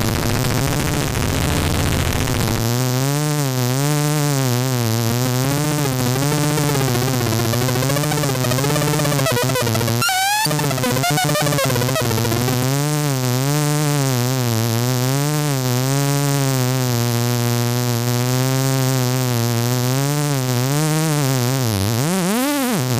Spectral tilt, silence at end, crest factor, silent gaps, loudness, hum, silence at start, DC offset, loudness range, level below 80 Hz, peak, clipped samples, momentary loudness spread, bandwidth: -4.5 dB/octave; 0 s; 16 dB; none; -18 LUFS; none; 0 s; under 0.1%; 1 LU; -38 dBFS; -2 dBFS; under 0.1%; 2 LU; 15.5 kHz